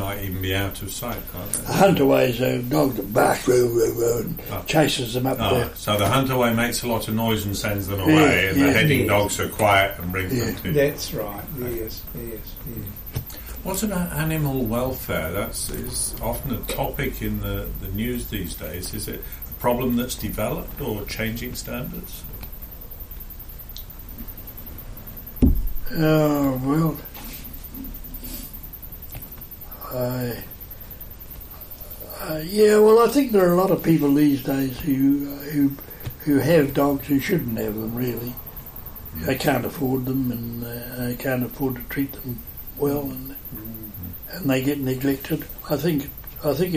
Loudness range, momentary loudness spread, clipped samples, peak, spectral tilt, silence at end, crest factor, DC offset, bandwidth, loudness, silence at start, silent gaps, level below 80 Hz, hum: 12 LU; 18 LU; under 0.1%; -4 dBFS; -5.5 dB/octave; 0 s; 20 dB; under 0.1%; 15.5 kHz; -22 LUFS; 0 s; none; -38 dBFS; none